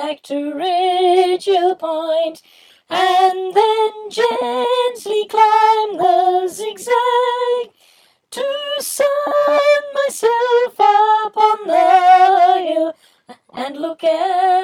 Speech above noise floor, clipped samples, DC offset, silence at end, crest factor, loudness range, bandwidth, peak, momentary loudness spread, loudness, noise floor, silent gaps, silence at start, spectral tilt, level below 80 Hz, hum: 39 dB; under 0.1%; under 0.1%; 0 s; 16 dB; 5 LU; 16 kHz; 0 dBFS; 12 LU; -15 LUFS; -54 dBFS; none; 0 s; -2 dB/octave; -74 dBFS; none